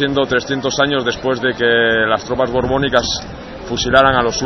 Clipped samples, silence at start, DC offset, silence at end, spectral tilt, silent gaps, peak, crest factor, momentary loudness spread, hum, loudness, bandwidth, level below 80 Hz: under 0.1%; 0 s; 0.1%; 0 s; -4 dB/octave; none; 0 dBFS; 16 dB; 9 LU; none; -15 LUFS; 6.6 kHz; -36 dBFS